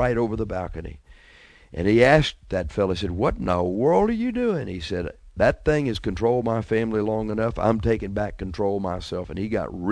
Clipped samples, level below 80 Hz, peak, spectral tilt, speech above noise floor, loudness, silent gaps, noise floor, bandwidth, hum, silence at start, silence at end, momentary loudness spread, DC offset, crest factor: under 0.1%; -40 dBFS; -2 dBFS; -7 dB/octave; 28 dB; -23 LUFS; none; -51 dBFS; 11 kHz; none; 0 s; 0 s; 10 LU; under 0.1%; 20 dB